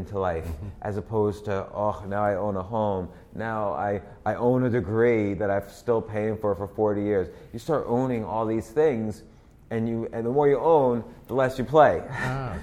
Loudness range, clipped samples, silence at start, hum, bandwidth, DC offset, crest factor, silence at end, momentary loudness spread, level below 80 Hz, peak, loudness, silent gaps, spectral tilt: 5 LU; under 0.1%; 0 s; none; 15 kHz; under 0.1%; 22 dB; 0 s; 12 LU; -48 dBFS; -4 dBFS; -26 LUFS; none; -8 dB/octave